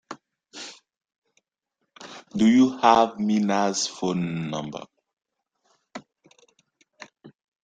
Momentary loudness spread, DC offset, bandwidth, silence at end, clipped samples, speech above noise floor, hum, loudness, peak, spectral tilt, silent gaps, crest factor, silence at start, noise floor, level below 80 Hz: 25 LU; under 0.1%; 9.2 kHz; 0.35 s; under 0.1%; 58 dB; none; -22 LUFS; -2 dBFS; -5 dB/octave; 1.18-1.22 s, 5.13-5.17 s; 24 dB; 0.1 s; -79 dBFS; -64 dBFS